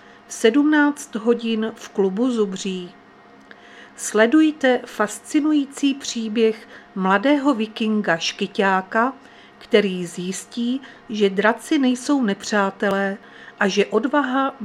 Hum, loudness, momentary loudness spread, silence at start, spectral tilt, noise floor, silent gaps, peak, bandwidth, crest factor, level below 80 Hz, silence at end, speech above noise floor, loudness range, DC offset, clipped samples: none; -20 LUFS; 10 LU; 0.3 s; -4.5 dB/octave; -47 dBFS; none; -2 dBFS; 14 kHz; 20 dB; -68 dBFS; 0 s; 27 dB; 2 LU; under 0.1%; under 0.1%